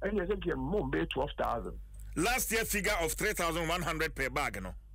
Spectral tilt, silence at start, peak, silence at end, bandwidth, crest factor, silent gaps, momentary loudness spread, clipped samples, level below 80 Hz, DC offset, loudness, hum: -3.5 dB/octave; 0 s; -20 dBFS; 0 s; 16 kHz; 12 dB; none; 7 LU; under 0.1%; -44 dBFS; under 0.1%; -32 LUFS; none